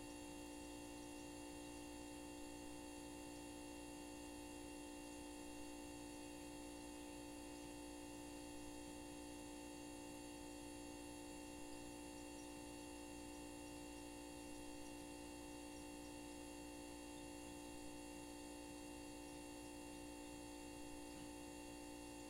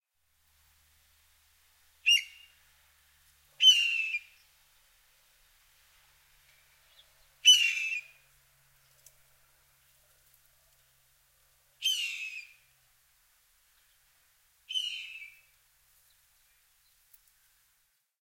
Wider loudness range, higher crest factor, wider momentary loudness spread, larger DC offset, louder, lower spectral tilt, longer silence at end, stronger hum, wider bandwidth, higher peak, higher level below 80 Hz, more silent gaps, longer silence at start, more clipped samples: second, 0 LU vs 14 LU; second, 12 dB vs 26 dB; second, 0 LU vs 23 LU; neither; second, -54 LUFS vs -25 LUFS; first, -3.5 dB/octave vs 6 dB/octave; second, 0 s vs 2.95 s; neither; about the same, 16 kHz vs 16.5 kHz; second, -42 dBFS vs -10 dBFS; first, -66 dBFS vs -76 dBFS; neither; second, 0 s vs 2.05 s; neither